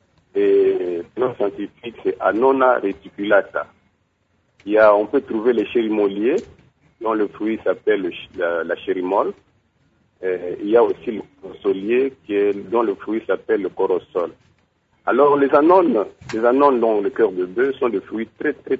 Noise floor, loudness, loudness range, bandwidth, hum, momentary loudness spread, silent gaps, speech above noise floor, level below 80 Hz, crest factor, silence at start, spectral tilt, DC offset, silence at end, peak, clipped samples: -65 dBFS; -19 LUFS; 5 LU; 7.4 kHz; none; 12 LU; none; 46 dB; -60 dBFS; 18 dB; 0.35 s; -7 dB/octave; under 0.1%; 0 s; -2 dBFS; under 0.1%